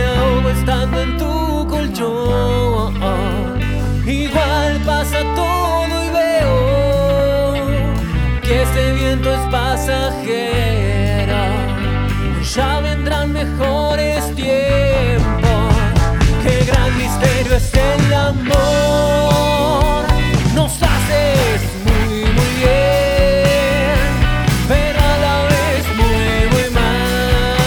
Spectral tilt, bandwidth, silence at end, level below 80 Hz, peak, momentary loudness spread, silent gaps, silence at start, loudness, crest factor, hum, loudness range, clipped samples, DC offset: -5.5 dB/octave; 19.5 kHz; 0 s; -20 dBFS; 0 dBFS; 5 LU; none; 0 s; -15 LUFS; 14 dB; none; 3 LU; under 0.1%; under 0.1%